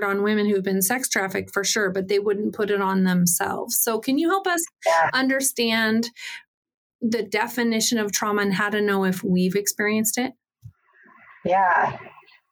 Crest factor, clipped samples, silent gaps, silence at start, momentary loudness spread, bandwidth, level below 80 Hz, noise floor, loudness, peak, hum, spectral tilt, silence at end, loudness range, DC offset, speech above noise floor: 16 dB; under 0.1%; 6.47-6.63 s, 6.74-6.99 s; 0 s; 6 LU; over 20 kHz; -68 dBFS; -54 dBFS; -22 LUFS; -6 dBFS; none; -3.5 dB/octave; 0.45 s; 3 LU; under 0.1%; 32 dB